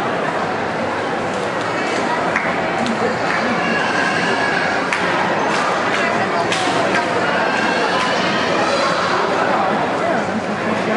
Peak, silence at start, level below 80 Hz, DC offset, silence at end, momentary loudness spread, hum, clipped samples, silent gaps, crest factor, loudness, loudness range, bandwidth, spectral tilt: -2 dBFS; 0 s; -56 dBFS; under 0.1%; 0 s; 4 LU; none; under 0.1%; none; 16 dB; -17 LUFS; 2 LU; 11.5 kHz; -4 dB/octave